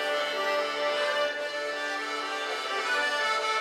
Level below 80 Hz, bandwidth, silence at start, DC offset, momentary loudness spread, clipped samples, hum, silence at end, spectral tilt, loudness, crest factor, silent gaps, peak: -82 dBFS; 15.5 kHz; 0 s; under 0.1%; 5 LU; under 0.1%; none; 0 s; 0 dB/octave; -28 LUFS; 14 dB; none; -16 dBFS